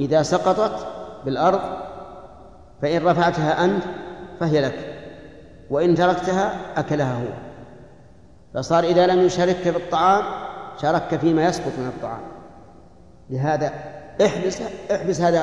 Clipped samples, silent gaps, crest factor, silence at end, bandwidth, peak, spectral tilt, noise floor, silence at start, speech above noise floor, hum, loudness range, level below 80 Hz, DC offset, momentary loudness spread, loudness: under 0.1%; none; 18 dB; 0 s; 10.5 kHz; -4 dBFS; -6 dB/octave; -49 dBFS; 0 s; 29 dB; none; 5 LU; -52 dBFS; 0.3%; 17 LU; -21 LUFS